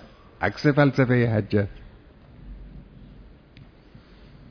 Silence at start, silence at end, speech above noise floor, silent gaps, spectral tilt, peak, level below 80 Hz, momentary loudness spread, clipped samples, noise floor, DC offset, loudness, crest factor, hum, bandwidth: 0.4 s; 1.45 s; 29 dB; none; -8.5 dB/octave; -4 dBFS; -48 dBFS; 26 LU; under 0.1%; -50 dBFS; under 0.1%; -22 LUFS; 22 dB; none; 5.4 kHz